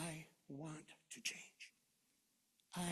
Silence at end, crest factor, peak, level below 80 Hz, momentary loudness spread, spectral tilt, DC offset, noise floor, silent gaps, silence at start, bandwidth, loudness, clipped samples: 0 s; 24 dB; -28 dBFS; -80 dBFS; 12 LU; -3.5 dB/octave; under 0.1%; -81 dBFS; none; 0 s; 13.5 kHz; -51 LUFS; under 0.1%